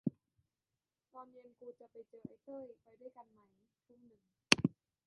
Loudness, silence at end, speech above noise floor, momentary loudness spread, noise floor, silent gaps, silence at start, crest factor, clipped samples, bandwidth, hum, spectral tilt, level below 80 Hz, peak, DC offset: -33 LUFS; 0.4 s; over 34 dB; 27 LU; under -90 dBFS; none; 0.05 s; 38 dB; under 0.1%; 5 kHz; none; -2.5 dB/octave; -74 dBFS; -6 dBFS; under 0.1%